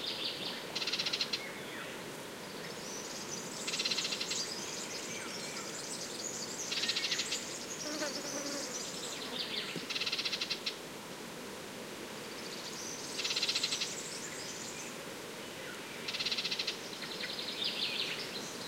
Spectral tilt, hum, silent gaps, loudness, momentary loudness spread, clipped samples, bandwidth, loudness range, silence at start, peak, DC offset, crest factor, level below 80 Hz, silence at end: -1 dB/octave; none; none; -37 LUFS; 11 LU; under 0.1%; 16 kHz; 2 LU; 0 s; -18 dBFS; under 0.1%; 20 dB; -76 dBFS; 0 s